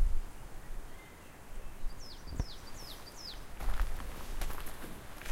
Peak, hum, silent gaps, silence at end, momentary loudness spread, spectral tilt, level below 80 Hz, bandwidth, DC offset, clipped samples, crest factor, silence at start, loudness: -16 dBFS; none; none; 0 s; 11 LU; -4 dB/octave; -38 dBFS; 16.5 kHz; under 0.1%; under 0.1%; 18 dB; 0 s; -45 LUFS